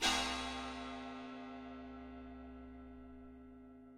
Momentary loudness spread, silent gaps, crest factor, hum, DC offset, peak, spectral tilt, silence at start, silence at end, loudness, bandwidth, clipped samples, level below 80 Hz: 18 LU; none; 24 dB; none; under 0.1%; -20 dBFS; -2 dB/octave; 0 s; 0 s; -44 LUFS; 13 kHz; under 0.1%; -58 dBFS